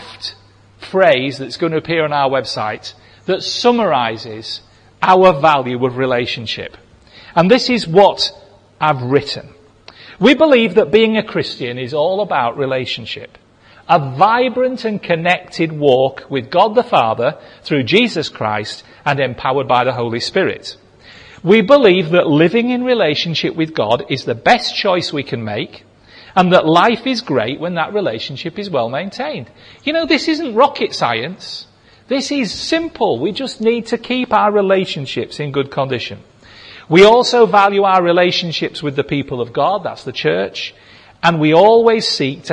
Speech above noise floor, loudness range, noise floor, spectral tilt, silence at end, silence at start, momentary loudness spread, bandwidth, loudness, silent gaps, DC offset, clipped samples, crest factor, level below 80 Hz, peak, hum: 31 dB; 5 LU; -45 dBFS; -5.5 dB/octave; 0 s; 0 s; 13 LU; 10.5 kHz; -15 LUFS; none; under 0.1%; under 0.1%; 16 dB; -52 dBFS; 0 dBFS; none